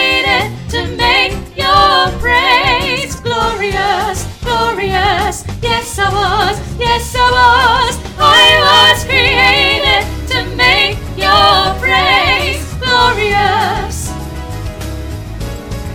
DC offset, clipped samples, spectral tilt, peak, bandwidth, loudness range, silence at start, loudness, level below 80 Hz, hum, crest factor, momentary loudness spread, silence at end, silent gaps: 0.5%; 0.2%; -3 dB/octave; 0 dBFS; 19.5 kHz; 6 LU; 0 s; -11 LUFS; -26 dBFS; none; 12 dB; 14 LU; 0 s; none